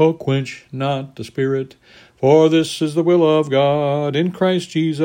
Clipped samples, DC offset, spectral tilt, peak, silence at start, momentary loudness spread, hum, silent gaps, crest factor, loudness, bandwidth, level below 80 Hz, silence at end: under 0.1%; under 0.1%; -6.5 dB/octave; -2 dBFS; 0 s; 11 LU; none; none; 16 dB; -17 LUFS; 16 kHz; -60 dBFS; 0 s